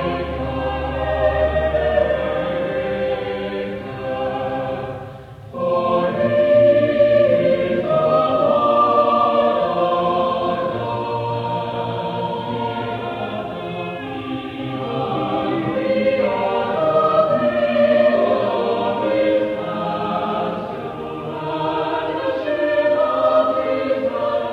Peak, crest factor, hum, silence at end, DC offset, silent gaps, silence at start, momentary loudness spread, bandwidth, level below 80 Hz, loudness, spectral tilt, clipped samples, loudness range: -4 dBFS; 16 dB; none; 0 s; under 0.1%; none; 0 s; 12 LU; 5.8 kHz; -40 dBFS; -19 LUFS; -8 dB/octave; under 0.1%; 8 LU